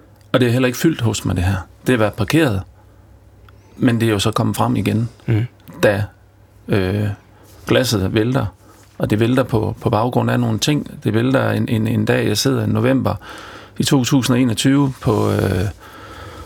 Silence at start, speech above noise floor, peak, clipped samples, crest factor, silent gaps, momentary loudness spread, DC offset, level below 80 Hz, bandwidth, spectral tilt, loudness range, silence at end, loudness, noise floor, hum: 0.35 s; 31 dB; -2 dBFS; under 0.1%; 16 dB; none; 10 LU; under 0.1%; -44 dBFS; 18.5 kHz; -6 dB/octave; 3 LU; 0 s; -18 LUFS; -47 dBFS; none